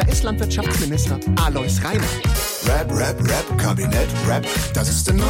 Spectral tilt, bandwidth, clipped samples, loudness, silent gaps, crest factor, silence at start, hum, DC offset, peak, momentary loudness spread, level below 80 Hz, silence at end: -4.5 dB/octave; 17 kHz; under 0.1%; -20 LUFS; none; 12 dB; 0 s; none; under 0.1%; -8 dBFS; 2 LU; -26 dBFS; 0 s